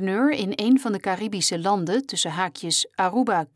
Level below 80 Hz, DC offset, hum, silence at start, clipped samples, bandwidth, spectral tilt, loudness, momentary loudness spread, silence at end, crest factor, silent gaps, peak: -72 dBFS; under 0.1%; none; 0 s; under 0.1%; 11 kHz; -3.5 dB/octave; -23 LUFS; 5 LU; 0.1 s; 14 dB; none; -8 dBFS